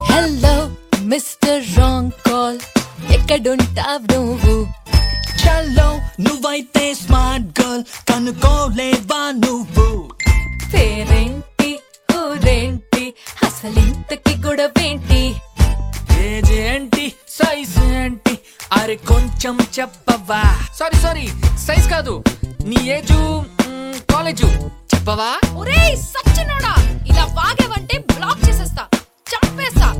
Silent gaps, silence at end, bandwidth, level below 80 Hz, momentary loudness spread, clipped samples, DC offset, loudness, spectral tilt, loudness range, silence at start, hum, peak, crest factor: none; 0 s; 17 kHz; -18 dBFS; 5 LU; under 0.1%; under 0.1%; -17 LUFS; -5 dB/octave; 2 LU; 0 s; none; 0 dBFS; 16 dB